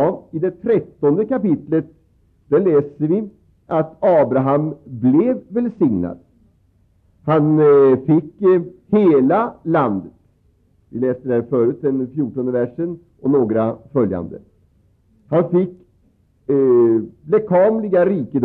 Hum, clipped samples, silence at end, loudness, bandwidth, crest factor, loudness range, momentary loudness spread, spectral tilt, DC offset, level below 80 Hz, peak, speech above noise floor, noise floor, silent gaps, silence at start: none; under 0.1%; 0 s; -17 LUFS; 4.1 kHz; 12 dB; 6 LU; 10 LU; -11.5 dB/octave; under 0.1%; -58 dBFS; -6 dBFS; 41 dB; -58 dBFS; none; 0 s